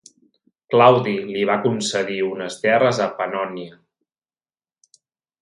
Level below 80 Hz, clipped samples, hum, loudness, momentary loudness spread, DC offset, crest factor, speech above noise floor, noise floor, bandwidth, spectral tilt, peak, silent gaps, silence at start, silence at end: -66 dBFS; under 0.1%; none; -19 LUFS; 12 LU; under 0.1%; 20 dB; over 71 dB; under -90 dBFS; 11.5 kHz; -5 dB/octave; 0 dBFS; none; 0.7 s; 1.7 s